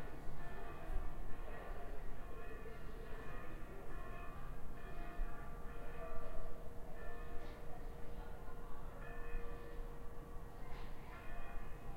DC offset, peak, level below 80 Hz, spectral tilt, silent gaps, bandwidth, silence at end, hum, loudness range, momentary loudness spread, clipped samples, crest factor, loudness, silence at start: under 0.1%; -26 dBFS; -46 dBFS; -6.5 dB/octave; none; 4.8 kHz; 0 s; none; 1 LU; 4 LU; under 0.1%; 14 dB; -53 LUFS; 0 s